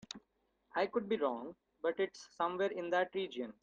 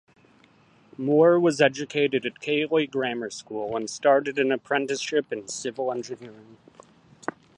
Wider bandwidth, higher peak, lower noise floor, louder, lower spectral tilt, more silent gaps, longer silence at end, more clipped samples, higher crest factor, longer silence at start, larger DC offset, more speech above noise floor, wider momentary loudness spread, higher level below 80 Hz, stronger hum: second, 9 kHz vs 11 kHz; second, -20 dBFS vs -4 dBFS; first, -79 dBFS vs -58 dBFS; second, -37 LUFS vs -24 LUFS; about the same, -4.5 dB/octave vs -4.5 dB/octave; neither; second, 0.1 s vs 1.05 s; neither; about the same, 18 dB vs 22 dB; second, 0.15 s vs 1 s; neither; first, 42 dB vs 33 dB; second, 10 LU vs 15 LU; second, -78 dBFS vs -72 dBFS; neither